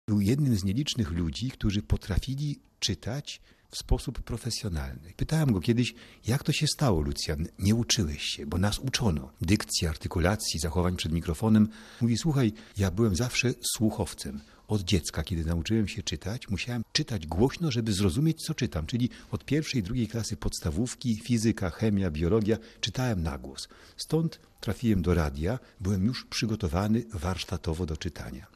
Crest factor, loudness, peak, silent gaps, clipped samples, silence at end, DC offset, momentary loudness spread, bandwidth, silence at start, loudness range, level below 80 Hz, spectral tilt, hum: 18 dB; -29 LUFS; -10 dBFS; none; under 0.1%; 0.1 s; under 0.1%; 9 LU; 14.5 kHz; 0.1 s; 4 LU; -42 dBFS; -5 dB/octave; none